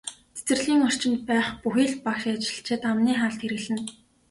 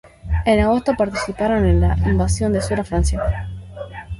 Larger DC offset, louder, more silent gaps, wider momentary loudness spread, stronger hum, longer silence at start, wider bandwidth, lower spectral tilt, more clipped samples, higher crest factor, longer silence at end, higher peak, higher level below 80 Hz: neither; second, -25 LUFS vs -19 LUFS; neither; second, 9 LU vs 13 LU; neither; about the same, 0.05 s vs 0.05 s; about the same, 11.5 kHz vs 11.5 kHz; second, -3.5 dB/octave vs -6.5 dB/octave; neither; about the same, 14 dB vs 16 dB; first, 0.4 s vs 0 s; second, -12 dBFS vs -2 dBFS; second, -60 dBFS vs -24 dBFS